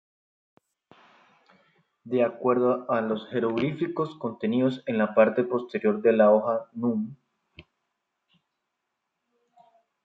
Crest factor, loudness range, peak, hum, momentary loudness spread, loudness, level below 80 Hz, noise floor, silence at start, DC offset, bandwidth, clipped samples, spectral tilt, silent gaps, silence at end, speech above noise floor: 20 dB; 7 LU; -8 dBFS; none; 10 LU; -25 LUFS; -72 dBFS; -81 dBFS; 2.05 s; under 0.1%; 5.6 kHz; under 0.1%; -9 dB/octave; none; 2.45 s; 57 dB